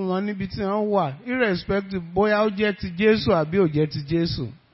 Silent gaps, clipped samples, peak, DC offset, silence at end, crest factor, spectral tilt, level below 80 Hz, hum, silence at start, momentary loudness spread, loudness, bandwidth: none; under 0.1%; -6 dBFS; under 0.1%; 0.2 s; 18 dB; -10 dB/octave; -46 dBFS; none; 0 s; 7 LU; -23 LUFS; 5.8 kHz